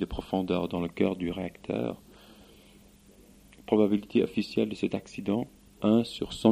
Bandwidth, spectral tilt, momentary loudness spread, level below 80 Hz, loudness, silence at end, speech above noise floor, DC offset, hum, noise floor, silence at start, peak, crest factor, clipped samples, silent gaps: 15 kHz; -7 dB/octave; 9 LU; -52 dBFS; -29 LUFS; 0 s; 28 dB; under 0.1%; 50 Hz at -55 dBFS; -56 dBFS; 0 s; -6 dBFS; 22 dB; under 0.1%; none